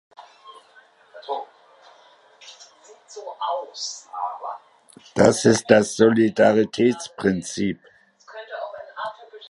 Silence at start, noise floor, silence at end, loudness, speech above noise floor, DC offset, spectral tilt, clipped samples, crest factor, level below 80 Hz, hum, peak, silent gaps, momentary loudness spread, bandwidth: 0.2 s; -54 dBFS; 0 s; -21 LUFS; 34 dB; under 0.1%; -5 dB/octave; under 0.1%; 24 dB; -60 dBFS; none; 0 dBFS; none; 24 LU; 11.5 kHz